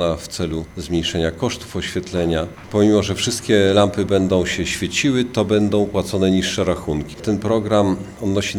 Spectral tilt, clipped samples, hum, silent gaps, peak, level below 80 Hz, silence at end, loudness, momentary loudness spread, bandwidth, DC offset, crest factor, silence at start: -5 dB/octave; under 0.1%; none; none; 0 dBFS; -42 dBFS; 0 s; -19 LUFS; 8 LU; 17 kHz; under 0.1%; 18 dB; 0 s